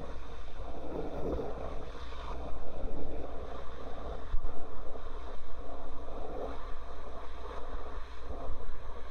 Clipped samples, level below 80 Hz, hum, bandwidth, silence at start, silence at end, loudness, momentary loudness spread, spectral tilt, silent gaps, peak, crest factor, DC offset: under 0.1%; -40 dBFS; none; 4.4 kHz; 0 s; 0 s; -44 LUFS; 7 LU; -7 dB/octave; none; -14 dBFS; 12 dB; under 0.1%